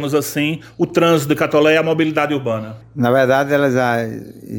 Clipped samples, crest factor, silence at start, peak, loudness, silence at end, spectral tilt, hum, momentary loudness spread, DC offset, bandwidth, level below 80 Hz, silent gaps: under 0.1%; 14 dB; 0 s; -2 dBFS; -16 LUFS; 0 s; -5.5 dB/octave; none; 10 LU; under 0.1%; 17 kHz; -56 dBFS; none